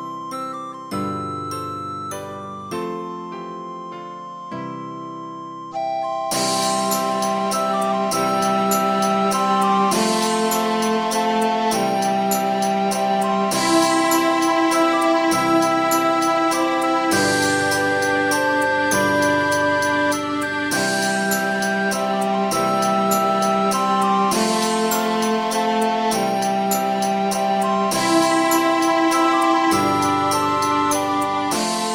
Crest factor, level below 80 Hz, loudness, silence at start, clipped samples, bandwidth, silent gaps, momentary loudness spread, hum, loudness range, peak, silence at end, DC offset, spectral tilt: 16 dB; -58 dBFS; -19 LUFS; 0 s; under 0.1%; 17 kHz; none; 12 LU; none; 11 LU; -4 dBFS; 0 s; under 0.1%; -3.5 dB/octave